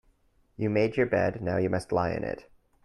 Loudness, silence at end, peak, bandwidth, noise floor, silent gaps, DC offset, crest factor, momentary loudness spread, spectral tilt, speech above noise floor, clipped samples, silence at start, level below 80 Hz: -28 LUFS; 0.4 s; -12 dBFS; 11.5 kHz; -66 dBFS; none; under 0.1%; 18 dB; 8 LU; -7.5 dB/octave; 38 dB; under 0.1%; 0.6 s; -56 dBFS